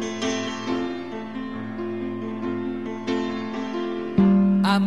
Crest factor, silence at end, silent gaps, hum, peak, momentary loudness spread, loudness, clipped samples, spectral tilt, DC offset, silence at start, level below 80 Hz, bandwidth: 18 dB; 0 s; none; none; -6 dBFS; 13 LU; -25 LUFS; under 0.1%; -6.5 dB/octave; 0.4%; 0 s; -56 dBFS; 11 kHz